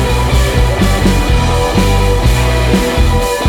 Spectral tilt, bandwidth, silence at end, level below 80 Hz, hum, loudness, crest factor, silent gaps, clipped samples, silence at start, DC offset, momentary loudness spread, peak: -5.5 dB/octave; 18 kHz; 0 s; -14 dBFS; none; -12 LUFS; 10 dB; none; under 0.1%; 0 s; under 0.1%; 1 LU; 0 dBFS